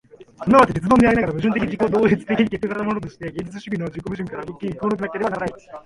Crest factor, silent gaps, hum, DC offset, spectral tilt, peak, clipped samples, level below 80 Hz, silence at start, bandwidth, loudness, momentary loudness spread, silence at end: 20 dB; none; none; under 0.1%; -7.5 dB/octave; 0 dBFS; under 0.1%; -44 dBFS; 0.2 s; 11.5 kHz; -20 LUFS; 15 LU; 0.05 s